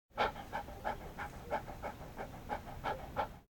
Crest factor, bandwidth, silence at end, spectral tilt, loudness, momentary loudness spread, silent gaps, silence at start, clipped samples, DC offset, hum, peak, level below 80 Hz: 22 dB; 17.5 kHz; 0.05 s; -5 dB/octave; -42 LUFS; 9 LU; none; 0.1 s; under 0.1%; under 0.1%; none; -20 dBFS; -54 dBFS